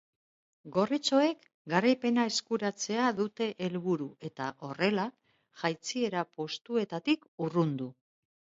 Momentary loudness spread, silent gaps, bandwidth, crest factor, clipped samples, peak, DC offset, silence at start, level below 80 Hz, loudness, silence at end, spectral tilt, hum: 11 LU; 1.54-1.65 s, 7.28-7.38 s; 8 kHz; 20 dB; under 0.1%; -12 dBFS; under 0.1%; 0.65 s; -78 dBFS; -31 LUFS; 0.65 s; -5 dB/octave; none